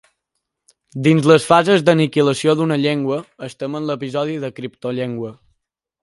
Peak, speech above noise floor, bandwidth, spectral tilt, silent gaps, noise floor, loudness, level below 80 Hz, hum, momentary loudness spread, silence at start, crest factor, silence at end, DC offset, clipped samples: 0 dBFS; 60 dB; 11.5 kHz; -6 dB/octave; none; -77 dBFS; -17 LUFS; -62 dBFS; none; 16 LU; 0.95 s; 18 dB; 0.7 s; under 0.1%; under 0.1%